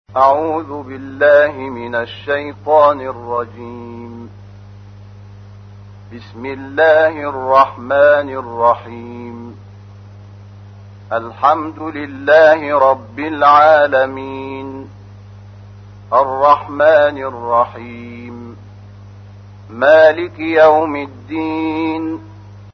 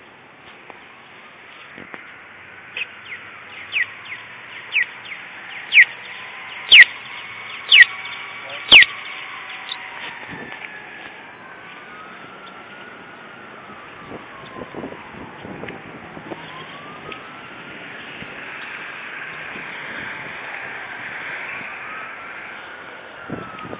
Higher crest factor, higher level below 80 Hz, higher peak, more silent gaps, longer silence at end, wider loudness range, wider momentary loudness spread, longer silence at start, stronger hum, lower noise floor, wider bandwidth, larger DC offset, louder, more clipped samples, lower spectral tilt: second, 16 dB vs 22 dB; first, -52 dBFS vs -60 dBFS; about the same, 0 dBFS vs 0 dBFS; neither; about the same, 0.05 s vs 0 s; second, 9 LU vs 23 LU; second, 21 LU vs 26 LU; about the same, 0.1 s vs 0 s; first, 50 Hz at -35 dBFS vs none; second, -36 dBFS vs -44 dBFS; first, 6.2 kHz vs 4 kHz; neither; about the same, -13 LUFS vs -14 LUFS; neither; first, -7 dB/octave vs 2.5 dB/octave